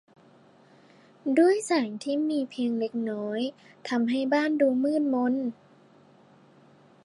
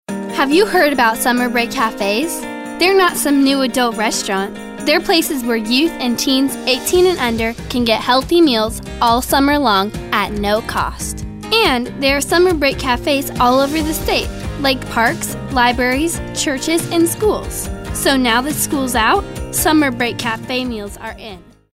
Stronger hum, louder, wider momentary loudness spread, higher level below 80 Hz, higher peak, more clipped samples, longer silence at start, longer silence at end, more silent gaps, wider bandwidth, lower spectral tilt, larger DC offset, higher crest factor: neither; second, -27 LUFS vs -15 LUFS; about the same, 10 LU vs 9 LU; second, -84 dBFS vs -34 dBFS; second, -10 dBFS vs 0 dBFS; neither; first, 1.25 s vs 0.1 s; first, 1.5 s vs 0.35 s; neither; second, 11.5 kHz vs 16 kHz; first, -5 dB/octave vs -3.5 dB/octave; neither; about the same, 18 dB vs 16 dB